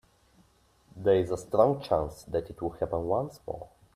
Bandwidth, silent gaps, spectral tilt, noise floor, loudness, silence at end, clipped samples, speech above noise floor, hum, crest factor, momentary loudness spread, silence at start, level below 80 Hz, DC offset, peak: 14.5 kHz; none; -7 dB/octave; -64 dBFS; -29 LUFS; 0.3 s; under 0.1%; 36 dB; none; 22 dB; 13 LU; 0.95 s; -54 dBFS; under 0.1%; -8 dBFS